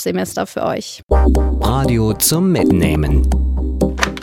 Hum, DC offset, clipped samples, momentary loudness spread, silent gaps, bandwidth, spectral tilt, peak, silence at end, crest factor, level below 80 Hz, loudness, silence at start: none; under 0.1%; under 0.1%; 7 LU; 1.03-1.07 s; 17 kHz; -5.5 dB/octave; 0 dBFS; 0 s; 14 dB; -18 dBFS; -16 LUFS; 0 s